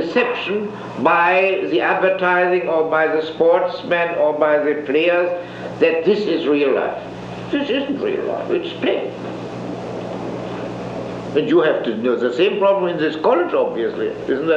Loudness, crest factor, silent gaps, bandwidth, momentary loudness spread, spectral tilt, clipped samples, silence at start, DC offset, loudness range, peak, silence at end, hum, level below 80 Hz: -18 LUFS; 16 dB; none; 8 kHz; 12 LU; -6.5 dB/octave; under 0.1%; 0 s; under 0.1%; 6 LU; -2 dBFS; 0 s; 60 Hz at -40 dBFS; -56 dBFS